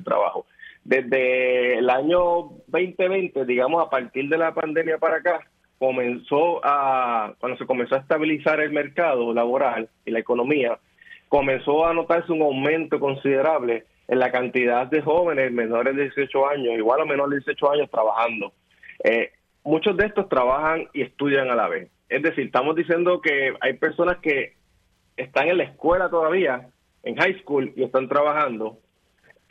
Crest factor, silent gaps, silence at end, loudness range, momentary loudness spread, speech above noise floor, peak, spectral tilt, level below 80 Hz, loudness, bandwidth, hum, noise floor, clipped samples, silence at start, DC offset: 18 dB; none; 0.8 s; 1 LU; 6 LU; 43 dB; -4 dBFS; -7.5 dB/octave; -54 dBFS; -22 LUFS; 6.2 kHz; none; -64 dBFS; under 0.1%; 0 s; under 0.1%